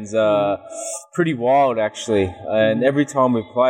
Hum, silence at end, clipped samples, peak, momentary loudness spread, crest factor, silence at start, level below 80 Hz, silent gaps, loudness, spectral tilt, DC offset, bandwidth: none; 0 s; under 0.1%; -4 dBFS; 9 LU; 14 dB; 0 s; -60 dBFS; none; -19 LUFS; -5.5 dB/octave; under 0.1%; 14 kHz